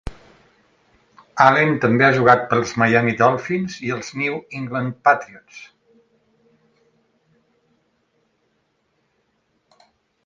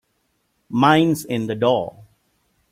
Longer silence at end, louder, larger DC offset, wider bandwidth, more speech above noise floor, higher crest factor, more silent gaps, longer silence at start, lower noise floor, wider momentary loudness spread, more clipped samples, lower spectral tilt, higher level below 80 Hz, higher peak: first, 4.6 s vs 0.7 s; about the same, -18 LUFS vs -19 LUFS; neither; second, 7.6 kHz vs 16 kHz; about the same, 50 dB vs 51 dB; about the same, 22 dB vs 20 dB; neither; second, 0.05 s vs 0.7 s; about the same, -68 dBFS vs -69 dBFS; first, 22 LU vs 11 LU; neither; about the same, -6 dB/octave vs -6 dB/octave; first, -52 dBFS vs -60 dBFS; about the same, 0 dBFS vs -2 dBFS